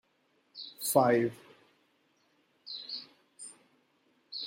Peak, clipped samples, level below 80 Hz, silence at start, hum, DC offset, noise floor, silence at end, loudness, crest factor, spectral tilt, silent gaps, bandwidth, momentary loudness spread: -10 dBFS; under 0.1%; -80 dBFS; 0.55 s; none; under 0.1%; -73 dBFS; 0 s; -31 LUFS; 26 dB; -4 dB/octave; none; 16 kHz; 23 LU